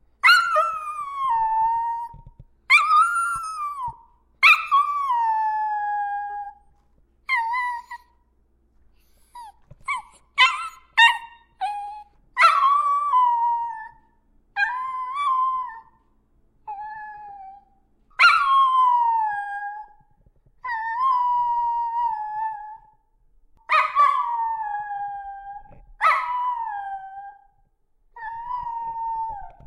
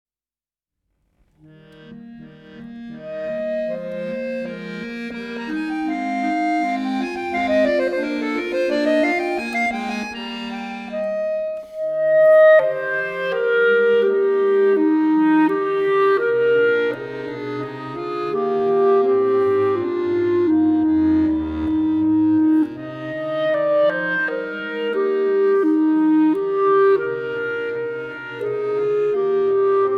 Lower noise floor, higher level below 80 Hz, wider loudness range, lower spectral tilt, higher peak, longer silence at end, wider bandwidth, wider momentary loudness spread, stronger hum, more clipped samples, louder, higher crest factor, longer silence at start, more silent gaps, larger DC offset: second, -63 dBFS vs under -90 dBFS; second, -58 dBFS vs -52 dBFS; about the same, 10 LU vs 10 LU; second, 0.5 dB/octave vs -6.5 dB/octave; first, -2 dBFS vs -6 dBFS; first, 0.15 s vs 0 s; first, 15.5 kHz vs 8.8 kHz; first, 21 LU vs 12 LU; neither; neither; about the same, -21 LUFS vs -19 LUFS; first, 20 dB vs 14 dB; second, 0.25 s vs 1.8 s; neither; neither